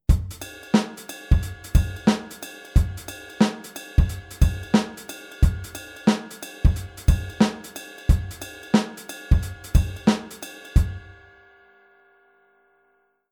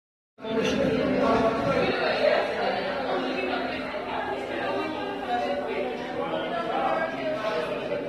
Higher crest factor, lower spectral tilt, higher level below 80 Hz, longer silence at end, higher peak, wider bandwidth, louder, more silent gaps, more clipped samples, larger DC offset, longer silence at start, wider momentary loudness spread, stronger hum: about the same, 20 dB vs 16 dB; about the same, -6 dB/octave vs -5.5 dB/octave; first, -26 dBFS vs -54 dBFS; first, 2.3 s vs 0 s; first, -4 dBFS vs -10 dBFS; first, 19 kHz vs 13 kHz; first, -24 LUFS vs -27 LUFS; neither; neither; neither; second, 0.1 s vs 0.4 s; first, 14 LU vs 8 LU; neither